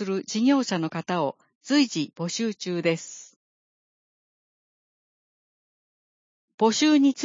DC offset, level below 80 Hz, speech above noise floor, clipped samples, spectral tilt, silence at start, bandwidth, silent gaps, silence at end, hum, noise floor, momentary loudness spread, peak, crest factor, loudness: under 0.1%; -78 dBFS; over 66 dB; under 0.1%; -4.5 dB/octave; 0 s; 7.6 kHz; 1.55-1.61 s, 3.36-6.48 s, 6.54-6.58 s; 0 s; none; under -90 dBFS; 12 LU; -10 dBFS; 18 dB; -24 LUFS